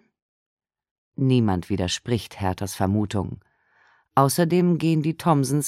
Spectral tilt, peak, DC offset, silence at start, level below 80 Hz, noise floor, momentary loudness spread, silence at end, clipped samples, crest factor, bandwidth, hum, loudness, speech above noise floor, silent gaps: -6 dB/octave; -4 dBFS; under 0.1%; 1.2 s; -54 dBFS; -61 dBFS; 9 LU; 0 s; under 0.1%; 20 dB; 16 kHz; none; -23 LUFS; 39 dB; none